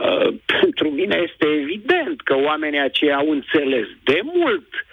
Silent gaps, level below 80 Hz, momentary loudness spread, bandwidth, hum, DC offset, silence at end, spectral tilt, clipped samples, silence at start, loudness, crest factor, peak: none; -60 dBFS; 3 LU; 6.6 kHz; none; under 0.1%; 0.1 s; -6 dB/octave; under 0.1%; 0 s; -19 LUFS; 14 dB; -4 dBFS